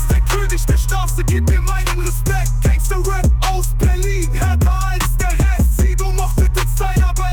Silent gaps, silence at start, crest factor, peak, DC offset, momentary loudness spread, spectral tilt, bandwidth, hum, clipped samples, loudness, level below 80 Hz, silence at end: none; 0 s; 8 dB; -6 dBFS; under 0.1%; 3 LU; -5 dB/octave; 19.5 kHz; none; under 0.1%; -17 LUFS; -16 dBFS; 0 s